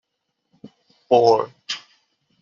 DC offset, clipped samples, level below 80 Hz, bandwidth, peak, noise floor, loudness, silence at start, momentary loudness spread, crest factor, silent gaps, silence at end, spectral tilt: under 0.1%; under 0.1%; -70 dBFS; 7.4 kHz; -2 dBFS; -76 dBFS; -20 LUFS; 0.65 s; 15 LU; 20 dB; none; 0.65 s; -3.5 dB/octave